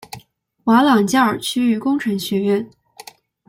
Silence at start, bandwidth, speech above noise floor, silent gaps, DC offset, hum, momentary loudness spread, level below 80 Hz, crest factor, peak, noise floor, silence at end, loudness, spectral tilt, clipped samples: 0.15 s; 16.5 kHz; 32 dB; none; under 0.1%; none; 17 LU; -60 dBFS; 16 dB; -4 dBFS; -48 dBFS; 0.8 s; -17 LUFS; -5 dB/octave; under 0.1%